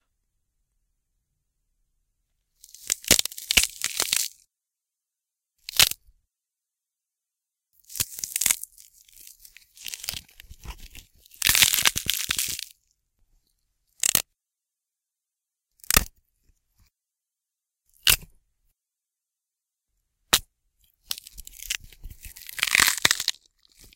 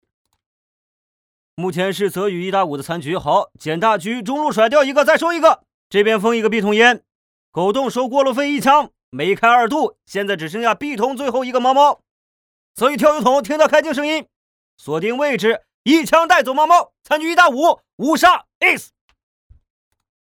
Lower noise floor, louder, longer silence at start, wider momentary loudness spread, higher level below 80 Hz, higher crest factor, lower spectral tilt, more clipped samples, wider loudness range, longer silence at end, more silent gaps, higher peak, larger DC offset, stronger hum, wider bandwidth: about the same, -87 dBFS vs under -90 dBFS; second, -22 LUFS vs -16 LUFS; first, 2.85 s vs 1.6 s; first, 22 LU vs 9 LU; first, -48 dBFS vs -58 dBFS; first, 28 dB vs 18 dB; second, 0.5 dB/octave vs -4 dB/octave; neither; first, 7 LU vs 4 LU; second, 0.65 s vs 1.45 s; second, none vs 5.74-5.90 s, 7.15-7.53 s, 9.03-9.12 s, 12.11-12.75 s, 14.36-14.78 s, 15.74-15.85 s, 17.93-17.98 s, 18.55-18.61 s; about the same, 0 dBFS vs 0 dBFS; neither; neither; second, 17 kHz vs 19 kHz